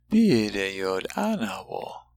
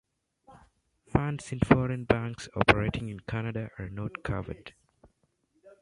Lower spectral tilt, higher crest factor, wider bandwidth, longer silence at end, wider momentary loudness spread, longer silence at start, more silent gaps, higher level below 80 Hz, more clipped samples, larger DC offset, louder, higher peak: about the same, -5.5 dB/octave vs -6.5 dB/octave; second, 16 dB vs 28 dB; first, 16 kHz vs 11.5 kHz; about the same, 0.15 s vs 0.1 s; about the same, 14 LU vs 13 LU; second, 0.1 s vs 0.5 s; neither; second, -56 dBFS vs -46 dBFS; neither; neither; first, -26 LUFS vs -29 LUFS; second, -10 dBFS vs -2 dBFS